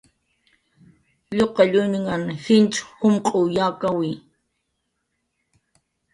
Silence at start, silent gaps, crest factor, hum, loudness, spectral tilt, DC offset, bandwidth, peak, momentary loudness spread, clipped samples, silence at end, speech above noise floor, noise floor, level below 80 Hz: 1.3 s; none; 20 dB; none; -20 LUFS; -5.5 dB/octave; under 0.1%; 11.5 kHz; -4 dBFS; 9 LU; under 0.1%; 1.95 s; 55 dB; -75 dBFS; -60 dBFS